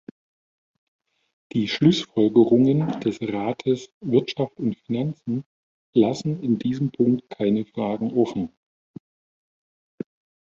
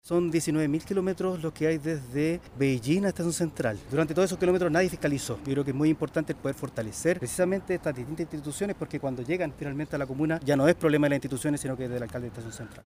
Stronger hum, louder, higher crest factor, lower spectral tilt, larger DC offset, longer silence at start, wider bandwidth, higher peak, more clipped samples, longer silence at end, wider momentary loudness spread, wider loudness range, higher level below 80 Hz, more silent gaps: neither; first, -23 LUFS vs -28 LUFS; about the same, 20 dB vs 20 dB; first, -7.5 dB/octave vs -6 dB/octave; neither; first, 1.55 s vs 0.05 s; second, 7.6 kHz vs 15.5 kHz; first, -4 dBFS vs -8 dBFS; neither; first, 2 s vs 0.05 s; about the same, 12 LU vs 10 LU; about the same, 5 LU vs 3 LU; second, -62 dBFS vs -54 dBFS; first, 3.93-4.01 s, 5.46-5.93 s vs none